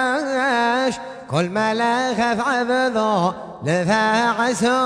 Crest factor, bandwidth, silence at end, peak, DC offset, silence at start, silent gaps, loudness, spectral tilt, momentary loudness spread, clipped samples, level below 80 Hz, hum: 14 dB; 11 kHz; 0 s; -6 dBFS; under 0.1%; 0 s; none; -19 LUFS; -4.5 dB/octave; 6 LU; under 0.1%; -58 dBFS; none